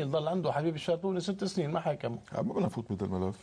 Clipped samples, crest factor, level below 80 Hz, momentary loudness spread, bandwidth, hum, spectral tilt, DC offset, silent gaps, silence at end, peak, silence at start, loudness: under 0.1%; 14 dB; -64 dBFS; 5 LU; 11 kHz; none; -7 dB/octave; under 0.1%; none; 0 s; -18 dBFS; 0 s; -33 LUFS